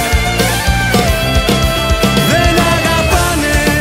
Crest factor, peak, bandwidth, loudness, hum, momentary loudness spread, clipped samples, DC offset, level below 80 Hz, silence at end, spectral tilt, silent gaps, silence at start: 12 dB; 0 dBFS; 16.5 kHz; -12 LUFS; none; 2 LU; under 0.1%; under 0.1%; -18 dBFS; 0 s; -4 dB/octave; none; 0 s